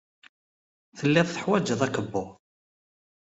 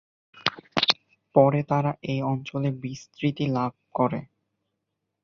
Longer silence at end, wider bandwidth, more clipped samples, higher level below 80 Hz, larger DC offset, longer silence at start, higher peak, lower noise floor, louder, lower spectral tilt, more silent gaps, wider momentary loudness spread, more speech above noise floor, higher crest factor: about the same, 1.05 s vs 1 s; first, 8 kHz vs 7.2 kHz; neither; about the same, -66 dBFS vs -64 dBFS; neither; first, 0.95 s vs 0.35 s; second, -6 dBFS vs -2 dBFS; first, under -90 dBFS vs -81 dBFS; about the same, -26 LUFS vs -26 LUFS; about the same, -5.5 dB/octave vs -6.5 dB/octave; neither; about the same, 10 LU vs 9 LU; first, over 65 dB vs 56 dB; about the same, 22 dB vs 24 dB